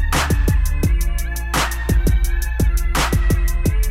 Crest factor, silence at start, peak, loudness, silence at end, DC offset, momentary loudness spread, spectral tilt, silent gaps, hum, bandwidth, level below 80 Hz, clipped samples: 8 dB; 0 s; -8 dBFS; -20 LUFS; 0 s; 0.5%; 4 LU; -4.5 dB/octave; none; none; 16.5 kHz; -18 dBFS; under 0.1%